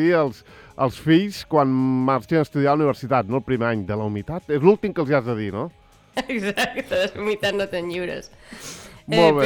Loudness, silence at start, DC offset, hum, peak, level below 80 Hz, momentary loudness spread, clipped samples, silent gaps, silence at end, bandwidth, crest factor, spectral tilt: -22 LUFS; 0 s; under 0.1%; none; -2 dBFS; -52 dBFS; 14 LU; under 0.1%; none; 0 s; 19.5 kHz; 20 dB; -6.5 dB/octave